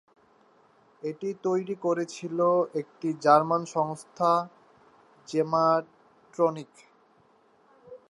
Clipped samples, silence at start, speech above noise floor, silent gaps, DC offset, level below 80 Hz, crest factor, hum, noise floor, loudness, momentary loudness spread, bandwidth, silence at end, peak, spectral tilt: under 0.1%; 1.05 s; 36 dB; none; under 0.1%; -80 dBFS; 22 dB; none; -62 dBFS; -27 LUFS; 12 LU; 11.5 kHz; 0.15 s; -6 dBFS; -6 dB/octave